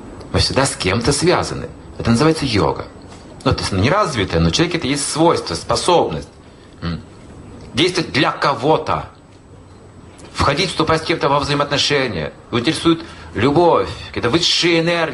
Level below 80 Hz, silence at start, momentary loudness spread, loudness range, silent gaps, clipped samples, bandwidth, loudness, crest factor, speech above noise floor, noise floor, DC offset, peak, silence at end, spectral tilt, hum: -38 dBFS; 0 s; 13 LU; 3 LU; none; under 0.1%; 11.5 kHz; -17 LUFS; 16 dB; 25 dB; -42 dBFS; under 0.1%; -2 dBFS; 0 s; -4.5 dB/octave; none